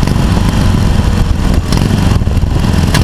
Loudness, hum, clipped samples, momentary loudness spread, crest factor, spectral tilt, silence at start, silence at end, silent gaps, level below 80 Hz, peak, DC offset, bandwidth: -12 LUFS; none; under 0.1%; 2 LU; 10 dB; -6 dB/octave; 0 s; 0 s; none; -14 dBFS; 0 dBFS; under 0.1%; 15.5 kHz